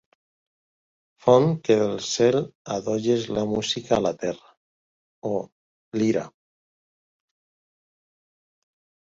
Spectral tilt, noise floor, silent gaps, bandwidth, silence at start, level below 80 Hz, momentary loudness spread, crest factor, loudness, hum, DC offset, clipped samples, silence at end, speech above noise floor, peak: -5.5 dB/octave; under -90 dBFS; 2.55-2.65 s, 4.57-5.22 s, 5.52-5.92 s; 7.8 kHz; 1.25 s; -60 dBFS; 13 LU; 24 dB; -24 LUFS; none; under 0.1%; under 0.1%; 2.75 s; over 68 dB; -2 dBFS